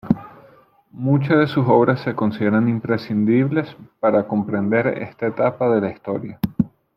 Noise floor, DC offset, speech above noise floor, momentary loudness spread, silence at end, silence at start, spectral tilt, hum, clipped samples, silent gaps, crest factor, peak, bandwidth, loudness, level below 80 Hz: -51 dBFS; under 0.1%; 33 dB; 9 LU; 0.3 s; 0.05 s; -10 dB/octave; none; under 0.1%; none; 18 dB; -2 dBFS; 14.5 kHz; -20 LUFS; -52 dBFS